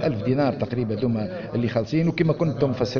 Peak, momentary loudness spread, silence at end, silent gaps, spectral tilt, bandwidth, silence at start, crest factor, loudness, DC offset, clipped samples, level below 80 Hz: -6 dBFS; 5 LU; 0 s; none; -7 dB/octave; 6.8 kHz; 0 s; 16 dB; -24 LUFS; under 0.1%; under 0.1%; -50 dBFS